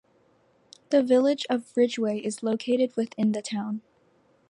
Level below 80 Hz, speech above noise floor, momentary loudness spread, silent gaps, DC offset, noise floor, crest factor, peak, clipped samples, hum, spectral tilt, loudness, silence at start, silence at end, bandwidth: -78 dBFS; 39 dB; 9 LU; none; under 0.1%; -64 dBFS; 16 dB; -10 dBFS; under 0.1%; none; -5.5 dB/octave; -26 LUFS; 0.9 s; 0.7 s; 11.5 kHz